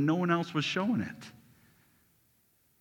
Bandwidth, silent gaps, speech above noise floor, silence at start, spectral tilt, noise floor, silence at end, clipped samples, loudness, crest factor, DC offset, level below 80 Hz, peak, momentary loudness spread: 18 kHz; none; 39 dB; 0 s; -6 dB/octave; -70 dBFS; 1.5 s; under 0.1%; -31 LUFS; 20 dB; under 0.1%; -74 dBFS; -14 dBFS; 19 LU